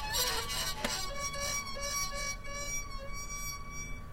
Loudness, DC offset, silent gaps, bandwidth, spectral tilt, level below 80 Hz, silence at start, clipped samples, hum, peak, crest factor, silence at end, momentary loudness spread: -35 LUFS; under 0.1%; none; 16.5 kHz; -1 dB/octave; -44 dBFS; 0 s; under 0.1%; none; -16 dBFS; 20 dB; 0 s; 10 LU